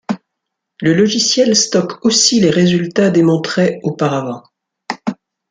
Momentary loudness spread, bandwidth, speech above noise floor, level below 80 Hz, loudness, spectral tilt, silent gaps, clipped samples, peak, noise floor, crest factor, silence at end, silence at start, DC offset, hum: 14 LU; 9.6 kHz; 64 dB; -56 dBFS; -13 LUFS; -4 dB/octave; none; under 0.1%; -2 dBFS; -77 dBFS; 14 dB; 0.35 s; 0.1 s; under 0.1%; none